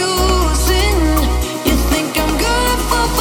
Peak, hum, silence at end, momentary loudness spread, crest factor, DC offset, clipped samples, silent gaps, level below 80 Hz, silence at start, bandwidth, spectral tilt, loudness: 0 dBFS; none; 0 s; 3 LU; 14 dB; under 0.1%; under 0.1%; none; -18 dBFS; 0 s; 18 kHz; -4 dB/octave; -15 LUFS